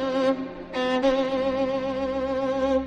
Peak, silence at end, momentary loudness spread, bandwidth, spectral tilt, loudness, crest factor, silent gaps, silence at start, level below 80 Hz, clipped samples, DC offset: -10 dBFS; 0 s; 5 LU; 8.8 kHz; -5.5 dB/octave; -25 LUFS; 14 dB; none; 0 s; -48 dBFS; under 0.1%; under 0.1%